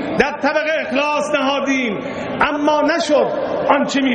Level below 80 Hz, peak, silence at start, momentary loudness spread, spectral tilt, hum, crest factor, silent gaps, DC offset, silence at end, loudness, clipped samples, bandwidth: -50 dBFS; 0 dBFS; 0 s; 4 LU; -4 dB/octave; none; 18 dB; none; under 0.1%; 0 s; -17 LUFS; under 0.1%; 9.4 kHz